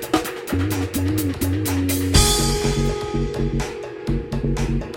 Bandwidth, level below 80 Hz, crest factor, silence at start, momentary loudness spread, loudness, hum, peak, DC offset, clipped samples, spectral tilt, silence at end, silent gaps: 17 kHz; -28 dBFS; 18 dB; 0 s; 9 LU; -21 LUFS; none; -2 dBFS; under 0.1%; under 0.1%; -4.5 dB/octave; 0 s; none